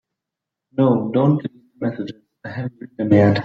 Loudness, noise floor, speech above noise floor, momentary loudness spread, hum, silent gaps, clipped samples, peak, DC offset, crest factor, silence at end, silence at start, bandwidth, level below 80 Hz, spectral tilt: -20 LUFS; -84 dBFS; 67 dB; 17 LU; none; none; under 0.1%; -2 dBFS; under 0.1%; 16 dB; 0 s; 0.75 s; 7 kHz; -58 dBFS; -9.5 dB/octave